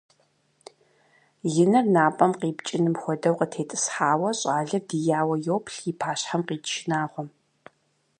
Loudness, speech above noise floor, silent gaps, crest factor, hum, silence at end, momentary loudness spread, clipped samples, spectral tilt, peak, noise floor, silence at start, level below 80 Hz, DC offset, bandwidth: -25 LUFS; 45 dB; none; 22 dB; none; 0.9 s; 9 LU; under 0.1%; -5 dB/octave; -4 dBFS; -69 dBFS; 1.45 s; -74 dBFS; under 0.1%; 10.5 kHz